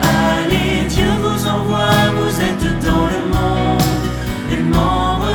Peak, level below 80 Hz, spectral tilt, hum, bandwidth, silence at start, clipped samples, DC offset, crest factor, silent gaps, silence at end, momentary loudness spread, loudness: -2 dBFS; -26 dBFS; -5.5 dB/octave; none; 19.5 kHz; 0 s; under 0.1%; under 0.1%; 14 dB; none; 0 s; 4 LU; -16 LUFS